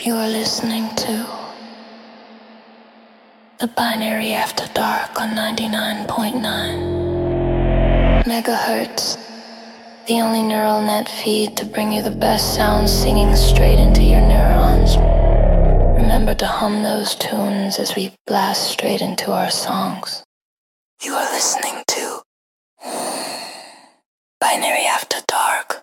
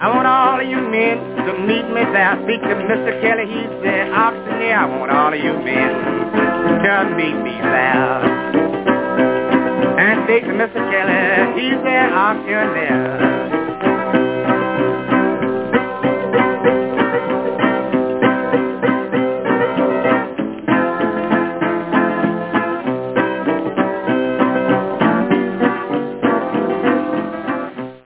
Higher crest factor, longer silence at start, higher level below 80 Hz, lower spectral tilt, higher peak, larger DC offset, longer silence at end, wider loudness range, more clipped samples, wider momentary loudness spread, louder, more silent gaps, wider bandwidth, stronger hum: about the same, 16 dB vs 14 dB; about the same, 0 s vs 0 s; first, -20 dBFS vs -54 dBFS; second, -4.5 dB/octave vs -9.5 dB/octave; about the same, 0 dBFS vs -2 dBFS; second, under 0.1% vs 0.1%; about the same, 0.05 s vs 0.1 s; first, 9 LU vs 3 LU; neither; first, 13 LU vs 5 LU; about the same, -18 LUFS vs -16 LUFS; first, 18.21-18.25 s, 20.25-20.97 s, 22.26-22.77 s, 24.06-24.41 s vs none; first, 17 kHz vs 4 kHz; neither